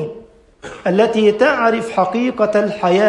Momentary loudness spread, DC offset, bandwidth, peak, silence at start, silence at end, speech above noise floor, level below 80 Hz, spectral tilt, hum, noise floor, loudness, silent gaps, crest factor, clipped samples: 9 LU; under 0.1%; 11 kHz; -2 dBFS; 0 s; 0 s; 27 dB; -54 dBFS; -6 dB/octave; none; -41 dBFS; -15 LUFS; none; 14 dB; under 0.1%